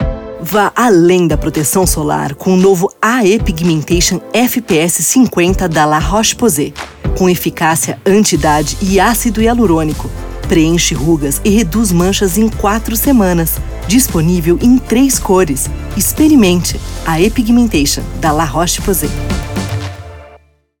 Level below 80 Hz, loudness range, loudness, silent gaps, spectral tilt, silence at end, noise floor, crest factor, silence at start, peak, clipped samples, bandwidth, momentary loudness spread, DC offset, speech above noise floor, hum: -24 dBFS; 1 LU; -12 LUFS; none; -4.5 dB/octave; 0.45 s; -44 dBFS; 12 dB; 0 s; 0 dBFS; under 0.1%; over 20 kHz; 9 LU; under 0.1%; 33 dB; none